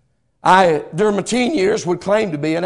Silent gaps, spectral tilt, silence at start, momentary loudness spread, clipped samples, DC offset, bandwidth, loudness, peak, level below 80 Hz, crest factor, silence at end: none; -5 dB/octave; 0.45 s; 7 LU; 0.1%; under 0.1%; 12 kHz; -16 LUFS; 0 dBFS; -52 dBFS; 16 dB; 0 s